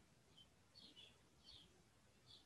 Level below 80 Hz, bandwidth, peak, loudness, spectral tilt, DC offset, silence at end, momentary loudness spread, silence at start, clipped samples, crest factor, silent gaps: -82 dBFS; 11.5 kHz; -52 dBFS; -65 LUFS; -3 dB/octave; under 0.1%; 0 s; 6 LU; 0 s; under 0.1%; 18 dB; none